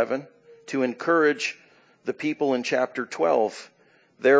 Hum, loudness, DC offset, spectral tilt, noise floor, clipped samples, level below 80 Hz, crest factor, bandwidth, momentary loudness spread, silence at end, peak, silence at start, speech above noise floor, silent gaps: none; -25 LUFS; under 0.1%; -4.5 dB/octave; -58 dBFS; under 0.1%; -84 dBFS; 20 dB; 8 kHz; 12 LU; 0 s; -6 dBFS; 0 s; 33 dB; none